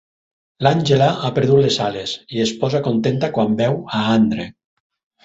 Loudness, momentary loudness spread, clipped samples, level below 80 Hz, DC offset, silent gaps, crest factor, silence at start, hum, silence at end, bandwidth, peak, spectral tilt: -18 LUFS; 8 LU; under 0.1%; -52 dBFS; under 0.1%; none; 16 dB; 0.6 s; none; 0.75 s; 8 kHz; -2 dBFS; -6 dB/octave